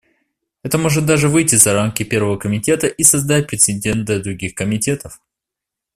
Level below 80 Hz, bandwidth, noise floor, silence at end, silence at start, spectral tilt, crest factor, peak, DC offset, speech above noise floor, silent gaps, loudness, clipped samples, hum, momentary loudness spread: -46 dBFS; 16 kHz; -84 dBFS; 0.8 s; 0.65 s; -4 dB/octave; 16 dB; 0 dBFS; under 0.1%; 68 dB; none; -15 LUFS; under 0.1%; none; 10 LU